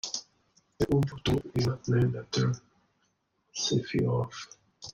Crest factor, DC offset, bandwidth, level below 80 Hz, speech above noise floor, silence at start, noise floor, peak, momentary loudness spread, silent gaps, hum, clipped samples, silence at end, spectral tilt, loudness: 16 dB; under 0.1%; 10.5 kHz; -52 dBFS; 46 dB; 0.05 s; -75 dBFS; -14 dBFS; 13 LU; none; none; under 0.1%; 0 s; -5.5 dB/octave; -30 LUFS